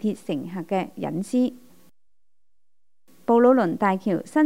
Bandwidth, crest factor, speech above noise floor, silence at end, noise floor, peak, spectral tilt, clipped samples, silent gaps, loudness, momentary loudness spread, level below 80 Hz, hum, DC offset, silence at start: 15.5 kHz; 18 dB; 65 dB; 0 s; -87 dBFS; -6 dBFS; -7 dB/octave; under 0.1%; none; -23 LUFS; 13 LU; -72 dBFS; none; 0.3%; 0.05 s